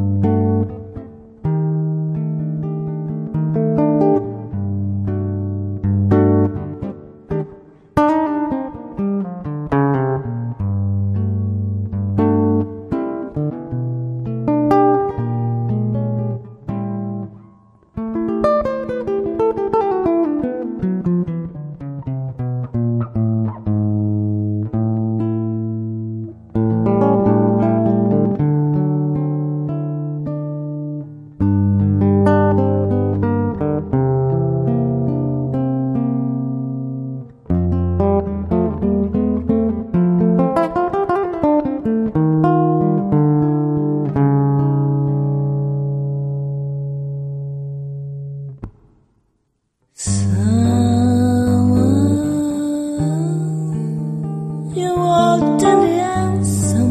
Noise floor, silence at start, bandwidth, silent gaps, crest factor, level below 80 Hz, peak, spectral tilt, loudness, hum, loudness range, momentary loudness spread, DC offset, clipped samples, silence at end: -67 dBFS; 0 s; 13 kHz; none; 18 dB; -42 dBFS; 0 dBFS; -8.5 dB/octave; -18 LUFS; none; 5 LU; 11 LU; under 0.1%; under 0.1%; 0 s